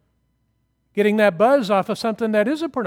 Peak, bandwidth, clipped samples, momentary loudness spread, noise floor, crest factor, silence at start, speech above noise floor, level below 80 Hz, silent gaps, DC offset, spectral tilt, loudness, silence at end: -2 dBFS; 16.5 kHz; under 0.1%; 7 LU; -68 dBFS; 18 dB; 0.95 s; 50 dB; -66 dBFS; none; under 0.1%; -6 dB/octave; -19 LUFS; 0 s